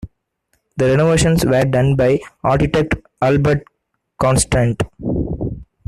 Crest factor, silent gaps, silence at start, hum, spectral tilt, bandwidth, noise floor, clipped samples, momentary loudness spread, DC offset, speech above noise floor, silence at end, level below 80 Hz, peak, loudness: 14 dB; none; 0.05 s; none; -6 dB/octave; 13.5 kHz; -72 dBFS; under 0.1%; 9 LU; under 0.1%; 57 dB; 0.25 s; -34 dBFS; -2 dBFS; -16 LUFS